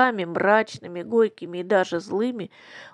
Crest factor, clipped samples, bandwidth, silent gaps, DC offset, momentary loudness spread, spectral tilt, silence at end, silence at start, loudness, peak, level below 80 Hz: 20 dB; under 0.1%; 10.5 kHz; none; under 0.1%; 15 LU; -5.5 dB/octave; 0.05 s; 0 s; -23 LUFS; -4 dBFS; -74 dBFS